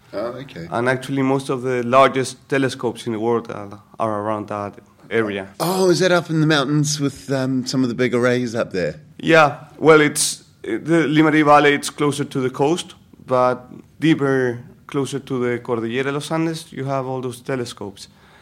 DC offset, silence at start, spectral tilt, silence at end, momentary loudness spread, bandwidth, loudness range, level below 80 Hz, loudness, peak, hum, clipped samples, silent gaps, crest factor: under 0.1%; 0.1 s; -5 dB/octave; 0.35 s; 14 LU; 16 kHz; 8 LU; -60 dBFS; -19 LUFS; 0 dBFS; none; under 0.1%; none; 20 dB